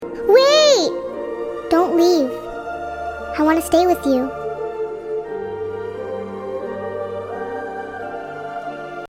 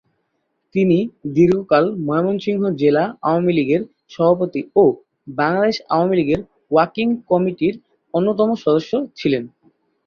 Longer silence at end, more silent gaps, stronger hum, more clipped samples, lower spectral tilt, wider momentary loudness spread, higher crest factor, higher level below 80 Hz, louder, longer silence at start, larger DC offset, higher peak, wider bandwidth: second, 0 s vs 0.6 s; neither; neither; neither; second, -3.5 dB/octave vs -8 dB/octave; first, 15 LU vs 8 LU; about the same, 18 dB vs 16 dB; first, -50 dBFS vs -56 dBFS; about the same, -20 LUFS vs -18 LUFS; second, 0 s vs 0.75 s; neither; about the same, 0 dBFS vs -2 dBFS; first, 16.5 kHz vs 6.8 kHz